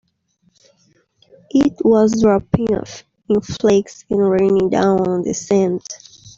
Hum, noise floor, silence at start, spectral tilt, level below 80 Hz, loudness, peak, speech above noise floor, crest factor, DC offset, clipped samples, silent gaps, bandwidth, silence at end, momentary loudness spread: none; -62 dBFS; 1.55 s; -6.5 dB/octave; -46 dBFS; -16 LUFS; -2 dBFS; 46 dB; 14 dB; under 0.1%; under 0.1%; none; 7.6 kHz; 0.1 s; 10 LU